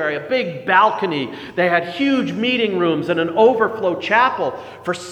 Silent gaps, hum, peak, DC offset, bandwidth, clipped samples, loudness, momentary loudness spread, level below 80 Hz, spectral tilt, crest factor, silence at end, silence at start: none; none; 0 dBFS; under 0.1%; 11.5 kHz; under 0.1%; -18 LUFS; 10 LU; -66 dBFS; -5.5 dB/octave; 18 dB; 0 s; 0 s